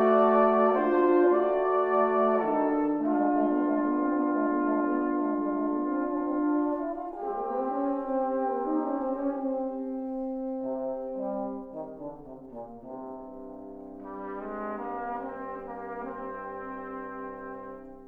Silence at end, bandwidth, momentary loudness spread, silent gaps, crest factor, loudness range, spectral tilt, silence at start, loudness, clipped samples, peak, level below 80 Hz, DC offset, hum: 0 s; 3.7 kHz; 18 LU; none; 18 dB; 13 LU; -9.5 dB/octave; 0 s; -28 LUFS; under 0.1%; -10 dBFS; -60 dBFS; under 0.1%; none